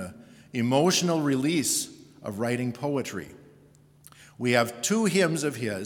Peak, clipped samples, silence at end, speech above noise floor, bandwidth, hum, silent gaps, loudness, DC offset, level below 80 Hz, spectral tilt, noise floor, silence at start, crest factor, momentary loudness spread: -8 dBFS; under 0.1%; 0 s; 31 dB; 18 kHz; none; none; -26 LUFS; under 0.1%; -70 dBFS; -4 dB/octave; -56 dBFS; 0 s; 20 dB; 15 LU